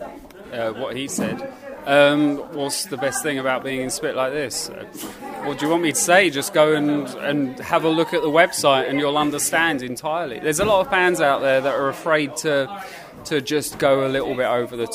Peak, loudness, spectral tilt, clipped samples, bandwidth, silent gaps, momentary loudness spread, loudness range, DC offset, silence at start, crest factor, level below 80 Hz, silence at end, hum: 0 dBFS; -20 LUFS; -3.5 dB/octave; under 0.1%; 16 kHz; none; 13 LU; 4 LU; under 0.1%; 0 s; 20 dB; -54 dBFS; 0 s; none